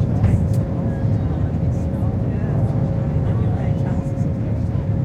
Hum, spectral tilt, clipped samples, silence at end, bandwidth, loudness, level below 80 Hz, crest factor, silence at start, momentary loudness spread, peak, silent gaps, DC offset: none; -10 dB/octave; under 0.1%; 0 s; 8 kHz; -21 LUFS; -30 dBFS; 14 dB; 0 s; 4 LU; -4 dBFS; none; under 0.1%